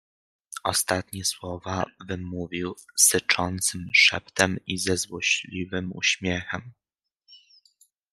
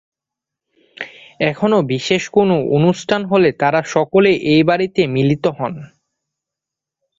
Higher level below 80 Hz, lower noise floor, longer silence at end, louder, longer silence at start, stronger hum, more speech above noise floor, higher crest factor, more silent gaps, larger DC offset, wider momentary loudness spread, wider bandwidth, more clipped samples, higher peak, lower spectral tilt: second, -62 dBFS vs -54 dBFS; second, -73 dBFS vs -84 dBFS; second, 0.75 s vs 1.35 s; second, -24 LUFS vs -15 LUFS; second, 0.5 s vs 1 s; neither; second, 47 dB vs 70 dB; first, 24 dB vs 16 dB; neither; neither; first, 15 LU vs 12 LU; first, 13.5 kHz vs 7.8 kHz; neither; second, -4 dBFS vs 0 dBFS; second, -2 dB/octave vs -6 dB/octave